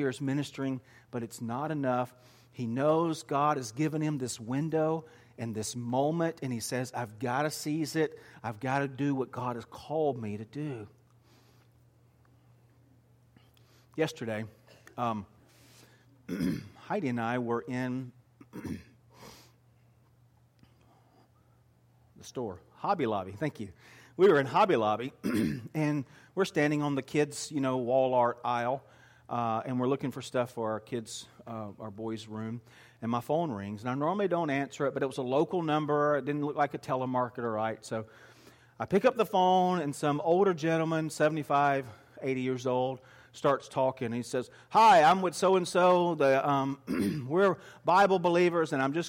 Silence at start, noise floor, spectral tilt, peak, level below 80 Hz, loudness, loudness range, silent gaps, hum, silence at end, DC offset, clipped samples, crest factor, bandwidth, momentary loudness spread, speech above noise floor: 0 s; -64 dBFS; -6 dB/octave; -14 dBFS; -70 dBFS; -30 LUFS; 12 LU; none; none; 0 s; under 0.1%; under 0.1%; 16 dB; 16.5 kHz; 15 LU; 34 dB